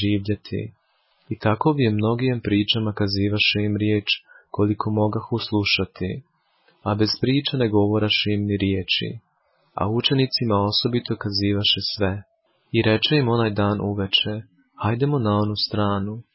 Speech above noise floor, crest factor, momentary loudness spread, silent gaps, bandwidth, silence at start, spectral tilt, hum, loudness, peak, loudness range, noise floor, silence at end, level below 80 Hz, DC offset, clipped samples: 43 dB; 16 dB; 9 LU; none; 5.8 kHz; 0 s; -9.5 dB/octave; none; -22 LUFS; -6 dBFS; 2 LU; -65 dBFS; 0.15 s; -46 dBFS; under 0.1%; under 0.1%